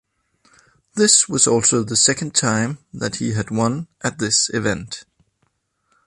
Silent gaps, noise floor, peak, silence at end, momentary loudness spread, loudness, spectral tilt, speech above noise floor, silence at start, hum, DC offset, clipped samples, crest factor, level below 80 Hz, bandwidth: none; -68 dBFS; 0 dBFS; 1.05 s; 14 LU; -17 LUFS; -3 dB/octave; 49 dB; 0.95 s; none; under 0.1%; under 0.1%; 20 dB; -52 dBFS; 11.5 kHz